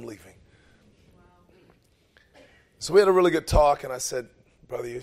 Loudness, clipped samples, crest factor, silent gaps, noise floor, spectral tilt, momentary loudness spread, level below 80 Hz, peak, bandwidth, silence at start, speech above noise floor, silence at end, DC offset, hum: -23 LUFS; under 0.1%; 20 dB; none; -61 dBFS; -5 dB/octave; 18 LU; -38 dBFS; -6 dBFS; 15.5 kHz; 0 s; 39 dB; 0 s; under 0.1%; none